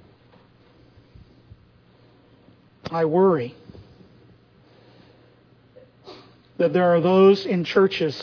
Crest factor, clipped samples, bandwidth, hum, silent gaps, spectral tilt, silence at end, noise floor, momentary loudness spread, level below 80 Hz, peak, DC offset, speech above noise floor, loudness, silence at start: 20 dB; under 0.1%; 5.4 kHz; none; none; -7.5 dB/octave; 0 s; -55 dBFS; 13 LU; -62 dBFS; -4 dBFS; under 0.1%; 37 dB; -19 LUFS; 2.85 s